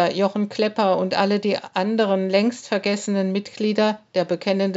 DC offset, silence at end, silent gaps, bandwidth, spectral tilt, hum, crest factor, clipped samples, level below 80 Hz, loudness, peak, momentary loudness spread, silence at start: under 0.1%; 0 s; none; 8 kHz; -4.5 dB/octave; none; 16 dB; under 0.1%; -76 dBFS; -22 LUFS; -4 dBFS; 4 LU; 0 s